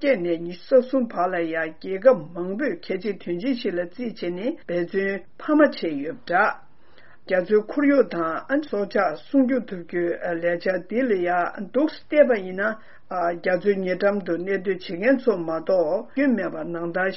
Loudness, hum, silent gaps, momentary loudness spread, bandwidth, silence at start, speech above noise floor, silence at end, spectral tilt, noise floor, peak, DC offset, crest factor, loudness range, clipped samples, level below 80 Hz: -23 LUFS; none; none; 9 LU; 5.8 kHz; 0 s; 31 dB; 0 s; -4.5 dB/octave; -54 dBFS; -4 dBFS; 0.8%; 20 dB; 2 LU; under 0.1%; -64 dBFS